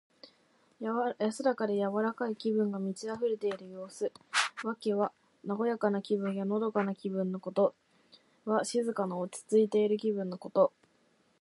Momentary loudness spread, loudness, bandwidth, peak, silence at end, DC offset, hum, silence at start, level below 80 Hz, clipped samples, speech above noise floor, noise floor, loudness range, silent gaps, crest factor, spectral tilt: 8 LU; -32 LUFS; 11.5 kHz; -12 dBFS; 0.7 s; under 0.1%; none; 0.25 s; -84 dBFS; under 0.1%; 38 dB; -70 dBFS; 2 LU; none; 20 dB; -5 dB/octave